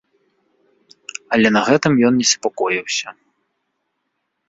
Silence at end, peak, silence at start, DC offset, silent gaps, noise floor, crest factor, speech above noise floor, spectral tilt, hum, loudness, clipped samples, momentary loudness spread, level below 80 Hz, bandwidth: 1.35 s; -2 dBFS; 1.3 s; under 0.1%; none; -73 dBFS; 18 dB; 57 dB; -3.5 dB/octave; none; -16 LUFS; under 0.1%; 19 LU; -58 dBFS; 8 kHz